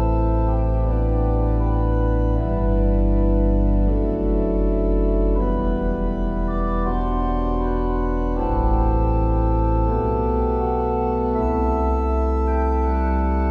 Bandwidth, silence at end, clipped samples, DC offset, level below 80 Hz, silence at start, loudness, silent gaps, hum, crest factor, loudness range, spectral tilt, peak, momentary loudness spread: 3.5 kHz; 0 s; under 0.1%; under 0.1%; -22 dBFS; 0 s; -21 LUFS; none; none; 10 dB; 2 LU; -11 dB/octave; -8 dBFS; 3 LU